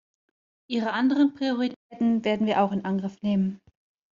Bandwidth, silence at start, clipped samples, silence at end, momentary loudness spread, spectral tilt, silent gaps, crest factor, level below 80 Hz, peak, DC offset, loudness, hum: 7.4 kHz; 0.7 s; under 0.1%; 0.6 s; 8 LU; -5 dB/octave; 1.76-1.90 s; 16 dB; -66 dBFS; -10 dBFS; under 0.1%; -26 LUFS; none